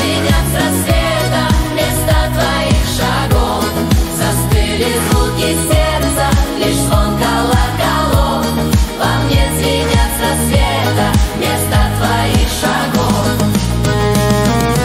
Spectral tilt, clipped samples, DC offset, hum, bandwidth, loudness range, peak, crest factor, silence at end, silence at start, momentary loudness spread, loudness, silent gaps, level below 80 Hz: -5 dB/octave; under 0.1%; under 0.1%; none; 16.5 kHz; 0 LU; 0 dBFS; 12 dB; 0 s; 0 s; 2 LU; -13 LUFS; none; -20 dBFS